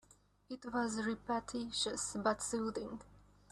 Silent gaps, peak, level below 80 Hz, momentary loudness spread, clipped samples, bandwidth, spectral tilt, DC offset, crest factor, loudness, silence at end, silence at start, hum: none; -20 dBFS; -66 dBFS; 12 LU; under 0.1%; 13 kHz; -3 dB/octave; under 0.1%; 20 dB; -39 LUFS; 0.3 s; 0.5 s; 50 Hz at -60 dBFS